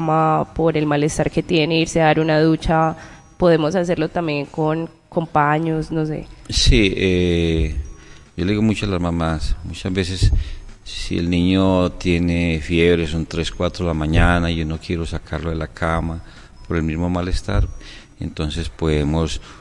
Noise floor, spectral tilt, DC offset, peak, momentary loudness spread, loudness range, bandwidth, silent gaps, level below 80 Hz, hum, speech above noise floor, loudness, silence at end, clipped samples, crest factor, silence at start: -39 dBFS; -6 dB/octave; under 0.1%; -2 dBFS; 10 LU; 6 LU; 11.5 kHz; none; -28 dBFS; none; 20 dB; -19 LUFS; 0.05 s; under 0.1%; 18 dB; 0 s